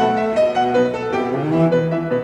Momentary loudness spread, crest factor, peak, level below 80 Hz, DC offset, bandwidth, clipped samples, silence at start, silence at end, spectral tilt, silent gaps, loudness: 4 LU; 12 dB; -4 dBFS; -52 dBFS; under 0.1%; 9.4 kHz; under 0.1%; 0 s; 0 s; -7.5 dB/octave; none; -18 LUFS